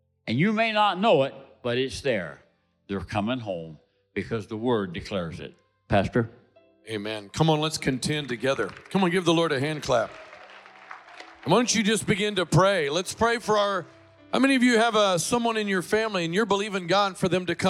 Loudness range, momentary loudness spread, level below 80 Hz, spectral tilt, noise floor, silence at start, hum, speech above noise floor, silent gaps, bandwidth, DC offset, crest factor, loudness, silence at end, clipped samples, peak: 7 LU; 14 LU; -56 dBFS; -4.5 dB/octave; -48 dBFS; 0.25 s; none; 23 dB; none; 15.5 kHz; under 0.1%; 16 dB; -25 LUFS; 0 s; under 0.1%; -10 dBFS